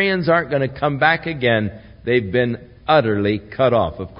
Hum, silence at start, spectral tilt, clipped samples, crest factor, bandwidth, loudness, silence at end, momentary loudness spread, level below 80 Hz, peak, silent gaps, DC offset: none; 0 s; -11.5 dB/octave; under 0.1%; 18 dB; 5.4 kHz; -18 LUFS; 0 s; 6 LU; -46 dBFS; 0 dBFS; none; under 0.1%